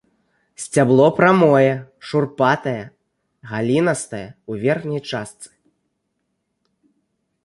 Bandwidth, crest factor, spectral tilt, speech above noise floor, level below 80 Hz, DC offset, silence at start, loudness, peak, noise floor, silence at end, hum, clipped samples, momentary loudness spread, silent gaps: 11.5 kHz; 18 dB; -6 dB/octave; 56 dB; -60 dBFS; under 0.1%; 0.6 s; -18 LUFS; -2 dBFS; -73 dBFS; 2 s; none; under 0.1%; 17 LU; none